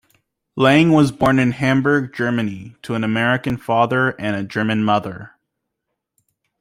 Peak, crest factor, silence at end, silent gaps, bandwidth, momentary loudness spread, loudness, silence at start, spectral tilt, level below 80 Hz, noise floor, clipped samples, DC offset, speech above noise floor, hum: -2 dBFS; 16 dB; 1.35 s; none; 15.5 kHz; 13 LU; -18 LUFS; 0.55 s; -6.5 dB/octave; -52 dBFS; -78 dBFS; under 0.1%; under 0.1%; 61 dB; none